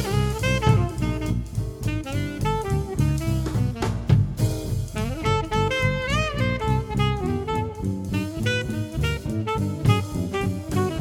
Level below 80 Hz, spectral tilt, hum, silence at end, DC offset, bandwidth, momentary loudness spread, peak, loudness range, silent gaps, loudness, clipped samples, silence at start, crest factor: -34 dBFS; -6 dB/octave; none; 0 s; under 0.1%; 16.5 kHz; 6 LU; -6 dBFS; 2 LU; none; -24 LUFS; under 0.1%; 0 s; 18 dB